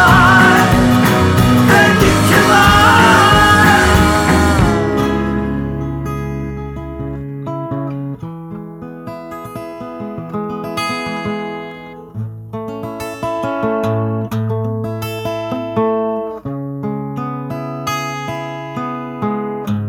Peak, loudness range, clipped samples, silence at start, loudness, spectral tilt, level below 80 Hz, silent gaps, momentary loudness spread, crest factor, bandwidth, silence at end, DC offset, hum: 0 dBFS; 16 LU; under 0.1%; 0 s; -14 LUFS; -5 dB/octave; -30 dBFS; none; 19 LU; 14 dB; 17.5 kHz; 0 s; under 0.1%; none